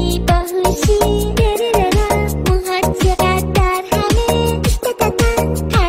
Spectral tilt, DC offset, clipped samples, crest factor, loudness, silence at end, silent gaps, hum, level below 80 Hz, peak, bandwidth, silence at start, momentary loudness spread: -5 dB/octave; 0.1%; under 0.1%; 14 dB; -15 LUFS; 0 s; none; none; -20 dBFS; 0 dBFS; 16.5 kHz; 0 s; 3 LU